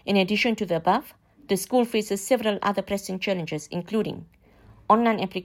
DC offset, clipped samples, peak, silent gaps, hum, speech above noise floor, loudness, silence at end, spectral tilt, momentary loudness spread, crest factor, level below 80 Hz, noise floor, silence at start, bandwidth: under 0.1%; under 0.1%; -4 dBFS; none; none; 29 dB; -25 LUFS; 0 s; -5 dB/octave; 10 LU; 20 dB; -60 dBFS; -53 dBFS; 0.05 s; 16.5 kHz